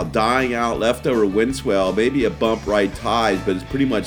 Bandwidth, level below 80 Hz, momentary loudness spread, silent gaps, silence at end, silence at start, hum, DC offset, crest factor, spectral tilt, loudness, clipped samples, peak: 19 kHz; -38 dBFS; 3 LU; none; 0 s; 0 s; none; under 0.1%; 16 dB; -5.5 dB/octave; -19 LUFS; under 0.1%; -4 dBFS